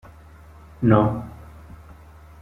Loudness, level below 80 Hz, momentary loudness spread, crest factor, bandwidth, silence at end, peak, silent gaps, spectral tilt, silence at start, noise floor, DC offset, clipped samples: -20 LUFS; -46 dBFS; 27 LU; 22 dB; 4 kHz; 1.1 s; -2 dBFS; none; -10 dB/octave; 0.8 s; -46 dBFS; under 0.1%; under 0.1%